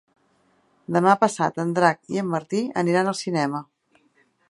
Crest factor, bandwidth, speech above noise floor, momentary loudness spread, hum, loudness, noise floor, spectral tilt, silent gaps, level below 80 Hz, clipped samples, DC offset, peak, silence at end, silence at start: 22 dB; 11.5 kHz; 42 dB; 8 LU; none; -22 LUFS; -64 dBFS; -5.5 dB/octave; none; -72 dBFS; under 0.1%; under 0.1%; -2 dBFS; 0.85 s; 0.9 s